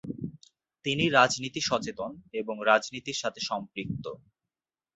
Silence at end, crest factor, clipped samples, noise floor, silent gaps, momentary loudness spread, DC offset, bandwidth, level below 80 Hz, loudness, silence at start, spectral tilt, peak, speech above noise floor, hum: 0.8 s; 24 dB; under 0.1%; under -90 dBFS; none; 16 LU; under 0.1%; 8.4 kHz; -62 dBFS; -28 LUFS; 0.05 s; -3.5 dB/octave; -6 dBFS; over 61 dB; none